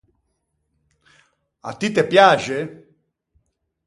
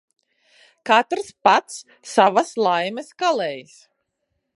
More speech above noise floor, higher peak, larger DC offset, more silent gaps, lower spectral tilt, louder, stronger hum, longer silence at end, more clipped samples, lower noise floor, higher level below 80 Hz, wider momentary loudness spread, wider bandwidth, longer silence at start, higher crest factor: about the same, 55 dB vs 55 dB; about the same, 0 dBFS vs -2 dBFS; neither; neither; first, -4.5 dB/octave vs -3 dB/octave; first, -17 LUFS vs -20 LUFS; neither; first, 1.1 s vs 0.95 s; neither; about the same, -72 dBFS vs -75 dBFS; first, -64 dBFS vs -76 dBFS; about the same, 21 LU vs 19 LU; about the same, 11.5 kHz vs 11.5 kHz; first, 1.65 s vs 0.85 s; about the same, 22 dB vs 20 dB